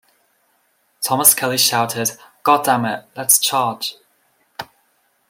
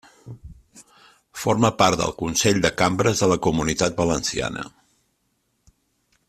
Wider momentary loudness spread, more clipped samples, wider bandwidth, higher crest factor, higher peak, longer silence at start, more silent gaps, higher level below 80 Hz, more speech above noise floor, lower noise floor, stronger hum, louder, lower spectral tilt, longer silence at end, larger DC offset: about the same, 19 LU vs 20 LU; neither; first, 17 kHz vs 15 kHz; about the same, 20 dB vs 22 dB; about the same, 0 dBFS vs -2 dBFS; first, 1 s vs 0.25 s; neither; second, -66 dBFS vs -46 dBFS; second, 45 dB vs 50 dB; second, -63 dBFS vs -70 dBFS; neither; first, -16 LUFS vs -21 LUFS; second, -1.5 dB/octave vs -4 dB/octave; second, 0.65 s vs 1.6 s; neither